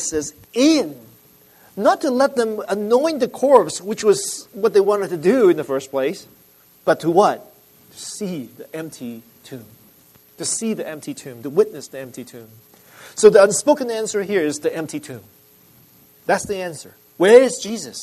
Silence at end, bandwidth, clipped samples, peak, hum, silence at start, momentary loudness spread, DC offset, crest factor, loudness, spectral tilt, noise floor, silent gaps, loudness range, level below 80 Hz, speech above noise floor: 0 s; 13.5 kHz; under 0.1%; 0 dBFS; none; 0 s; 20 LU; under 0.1%; 20 dB; -18 LUFS; -4 dB/octave; -51 dBFS; none; 8 LU; -62 dBFS; 33 dB